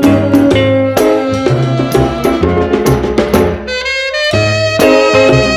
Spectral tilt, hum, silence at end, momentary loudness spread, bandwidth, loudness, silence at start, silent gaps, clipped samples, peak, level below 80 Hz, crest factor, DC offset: -6 dB/octave; none; 0 s; 5 LU; 17.5 kHz; -11 LUFS; 0 s; none; 0.3%; 0 dBFS; -28 dBFS; 10 dB; under 0.1%